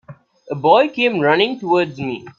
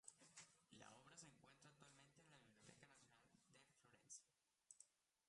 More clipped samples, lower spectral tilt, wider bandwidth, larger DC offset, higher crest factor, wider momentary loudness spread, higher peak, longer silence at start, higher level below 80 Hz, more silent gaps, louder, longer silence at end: neither; first, -6.5 dB/octave vs -2 dB/octave; second, 7.4 kHz vs 11 kHz; neither; second, 18 dB vs 28 dB; first, 10 LU vs 6 LU; first, 0 dBFS vs -44 dBFS; about the same, 0.1 s vs 0.05 s; first, -62 dBFS vs under -90 dBFS; neither; first, -16 LUFS vs -66 LUFS; about the same, 0.1 s vs 0 s